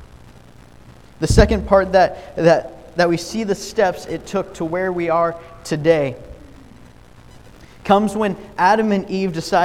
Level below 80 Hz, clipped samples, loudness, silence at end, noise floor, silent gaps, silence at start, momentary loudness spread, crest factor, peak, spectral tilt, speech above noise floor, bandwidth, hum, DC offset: -32 dBFS; under 0.1%; -18 LUFS; 0 s; -44 dBFS; none; 0 s; 11 LU; 18 dB; 0 dBFS; -6 dB/octave; 27 dB; 16 kHz; none; 0.3%